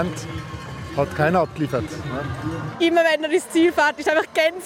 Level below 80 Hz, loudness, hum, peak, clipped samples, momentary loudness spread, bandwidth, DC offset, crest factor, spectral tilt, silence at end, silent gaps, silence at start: -48 dBFS; -21 LUFS; none; -6 dBFS; under 0.1%; 13 LU; 16.5 kHz; under 0.1%; 16 dB; -5.5 dB/octave; 0 s; none; 0 s